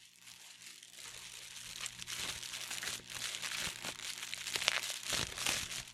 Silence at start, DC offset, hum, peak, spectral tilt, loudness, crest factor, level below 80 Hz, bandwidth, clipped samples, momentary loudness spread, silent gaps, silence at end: 0 s; under 0.1%; 60 Hz at -65 dBFS; -8 dBFS; 0 dB/octave; -38 LUFS; 34 dB; -66 dBFS; 16.5 kHz; under 0.1%; 17 LU; none; 0 s